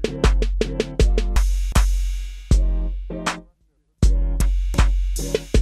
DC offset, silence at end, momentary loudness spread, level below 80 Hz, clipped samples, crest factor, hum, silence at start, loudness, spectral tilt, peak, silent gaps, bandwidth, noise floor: under 0.1%; 0 s; 7 LU; -20 dBFS; under 0.1%; 14 dB; none; 0 s; -23 LUFS; -5.5 dB/octave; -4 dBFS; none; 13 kHz; -63 dBFS